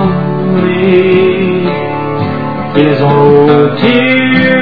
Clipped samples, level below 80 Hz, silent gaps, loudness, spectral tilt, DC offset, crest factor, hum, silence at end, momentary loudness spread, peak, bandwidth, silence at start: 0.9%; -46 dBFS; none; -9 LUFS; -9.5 dB/octave; 3%; 8 dB; none; 0 s; 9 LU; 0 dBFS; 5.4 kHz; 0 s